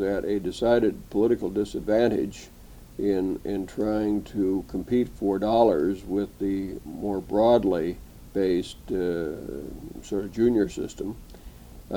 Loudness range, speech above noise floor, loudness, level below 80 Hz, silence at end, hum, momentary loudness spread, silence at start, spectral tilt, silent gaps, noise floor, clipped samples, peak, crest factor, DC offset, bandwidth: 3 LU; 19 dB; -26 LUFS; -46 dBFS; 0 s; none; 14 LU; 0 s; -7 dB/octave; none; -44 dBFS; under 0.1%; -6 dBFS; 20 dB; under 0.1%; 18.5 kHz